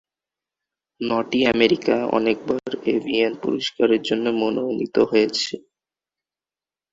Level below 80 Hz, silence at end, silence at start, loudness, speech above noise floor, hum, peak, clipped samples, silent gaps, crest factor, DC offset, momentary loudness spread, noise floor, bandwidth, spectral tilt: -60 dBFS; 1.35 s; 1 s; -21 LUFS; over 70 dB; none; -4 dBFS; under 0.1%; none; 20 dB; under 0.1%; 7 LU; under -90 dBFS; 8 kHz; -4.5 dB/octave